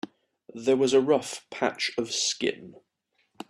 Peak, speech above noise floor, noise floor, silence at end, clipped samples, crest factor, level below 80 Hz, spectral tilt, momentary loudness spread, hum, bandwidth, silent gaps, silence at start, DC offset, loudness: -8 dBFS; 47 dB; -73 dBFS; 0.8 s; under 0.1%; 20 dB; -72 dBFS; -3 dB/octave; 19 LU; none; 13 kHz; none; 0.05 s; under 0.1%; -26 LUFS